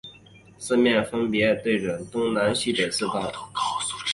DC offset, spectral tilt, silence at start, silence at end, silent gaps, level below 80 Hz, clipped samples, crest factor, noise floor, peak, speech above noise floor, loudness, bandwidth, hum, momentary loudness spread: under 0.1%; -4 dB/octave; 0.05 s; 0 s; none; -58 dBFS; under 0.1%; 16 dB; -50 dBFS; -8 dBFS; 27 dB; -24 LUFS; 11.5 kHz; none; 8 LU